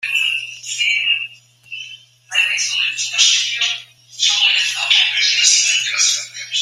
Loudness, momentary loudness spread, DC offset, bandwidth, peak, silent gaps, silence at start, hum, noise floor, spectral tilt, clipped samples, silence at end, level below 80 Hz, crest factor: -14 LUFS; 15 LU; under 0.1%; 16 kHz; 0 dBFS; none; 0 s; none; -39 dBFS; 5 dB/octave; under 0.1%; 0 s; -78 dBFS; 18 dB